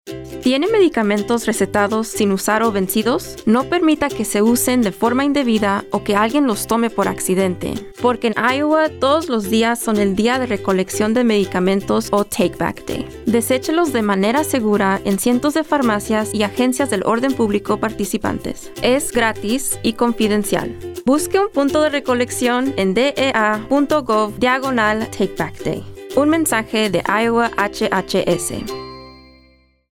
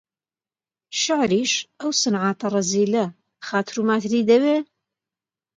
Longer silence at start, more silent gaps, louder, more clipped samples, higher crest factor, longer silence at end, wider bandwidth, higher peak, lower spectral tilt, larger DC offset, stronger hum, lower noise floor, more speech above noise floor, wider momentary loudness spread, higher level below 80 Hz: second, 0.05 s vs 0.9 s; neither; first, -17 LUFS vs -21 LUFS; neither; about the same, 16 dB vs 18 dB; second, 0.8 s vs 0.95 s; first, 18 kHz vs 9.4 kHz; about the same, -2 dBFS vs -4 dBFS; about the same, -4.5 dB/octave vs -3.5 dB/octave; neither; neither; second, -53 dBFS vs under -90 dBFS; second, 36 dB vs over 70 dB; second, 6 LU vs 9 LU; first, -46 dBFS vs -66 dBFS